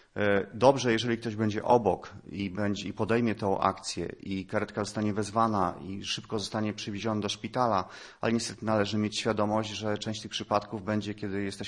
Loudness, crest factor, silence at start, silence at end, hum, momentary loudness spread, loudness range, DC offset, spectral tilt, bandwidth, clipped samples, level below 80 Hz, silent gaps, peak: -30 LUFS; 22 dB; 0.15 s; 0 s; none; 10 LU; 3 LU; under 0.1%; -5 dB/octave; 11.5 kHz; under 0.1%; -62 dBFS; none; -6 dBFS